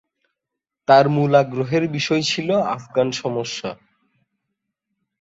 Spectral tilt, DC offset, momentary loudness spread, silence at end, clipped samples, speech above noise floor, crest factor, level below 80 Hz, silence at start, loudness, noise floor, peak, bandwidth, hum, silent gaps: -5.5 dB/octave; under 0.1%; 13 LU; 1.45 s; under 0.1%; 65 dB; 20 dB; -62 dBFS; 0.9 s; -19 LUFS; -84 dBFS; -2 dBFS; 8 kHz; none; none